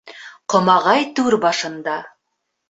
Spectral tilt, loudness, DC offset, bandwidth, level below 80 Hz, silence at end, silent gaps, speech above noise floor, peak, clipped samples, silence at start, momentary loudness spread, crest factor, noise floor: -4 dB/octave; -17 LUFS; under 0.1%; 8.2 kHz; -64 dBFS; 0.65 s; none; 58 dB; -2 dBFS; under 0.1%; 0.05 s; 15 LU; 18 dB; -75 dBFS